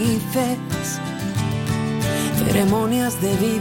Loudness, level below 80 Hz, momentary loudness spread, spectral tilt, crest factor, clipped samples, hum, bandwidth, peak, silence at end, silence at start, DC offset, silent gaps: -21 LUFS; -42 dBFS; 7 LU; -5.5 dB/octave; 14 dB; under 0.1%; none; 17 kHz; -6 dBFS; 0 s; 0 s; under 0.1%; none